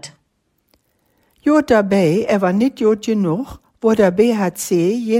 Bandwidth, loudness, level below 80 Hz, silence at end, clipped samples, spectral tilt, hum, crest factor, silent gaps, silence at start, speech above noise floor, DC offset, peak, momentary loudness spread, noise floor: 16 kHz; -16 LUFS; -50 dBFS; 0 s; under 0.1%; -6 dB/octave; none; 16 dB; none; 0.05 s; 51 dB; under 0.1%; -2 dBFS; 7 LU; -66 dBFS